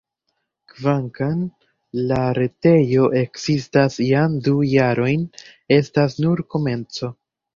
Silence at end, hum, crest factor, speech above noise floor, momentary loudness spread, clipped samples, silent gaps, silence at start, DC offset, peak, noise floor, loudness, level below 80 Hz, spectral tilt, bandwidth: 0.45 s; none; 18 dB; 56 dB; 10 LU; under 0.1%; none; 0.8 s; under 0.1%; -2 dBFS; -74 dBFS; -19 LUFS; -52 dBFS; -7.5 dB/octave; 7.4 kHz